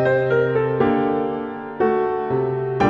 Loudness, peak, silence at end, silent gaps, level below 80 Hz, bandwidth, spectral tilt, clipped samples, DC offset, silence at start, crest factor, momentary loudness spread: -21 LUFS; -6 dBFS; 0 s; none; -50 dBFS; 6.6 kHz; -8.5 dB/octave; under 0.1%; under 0.1%; 0 s; 14 dB; 6 LU